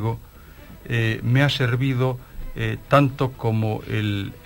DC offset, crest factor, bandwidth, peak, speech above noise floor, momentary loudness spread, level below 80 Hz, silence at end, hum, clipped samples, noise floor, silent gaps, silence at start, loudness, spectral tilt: under 0.1%; 20 dB; 16.5 kHz; -2 dBFS; 22 dB; 12 LU; -42 dBFS; 0.05 s; none; under 0.1%; -43 dBFS; none; 0 s; -22 LUFS; -7 dB/octave